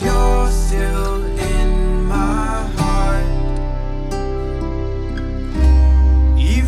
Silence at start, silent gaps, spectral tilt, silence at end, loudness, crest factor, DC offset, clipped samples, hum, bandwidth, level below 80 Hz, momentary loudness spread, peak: 0 s; none; -6.5 dB/octave; 0 s; -19 LUFS; 12 dB; under 0.1%; under 0.1%; none; 12.5 kHz; -16 dBFS; 10 LU; -4 dBFS